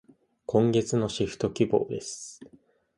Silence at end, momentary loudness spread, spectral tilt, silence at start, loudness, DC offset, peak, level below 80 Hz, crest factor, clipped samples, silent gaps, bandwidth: 0.5 s; 16 LU; -6 dB/octave; 0.5 s; -27 LUFS; under 0.1%; -10 dBFS; -58 dBFS; 20 dB; under 0.1%; none; 11.5 kHz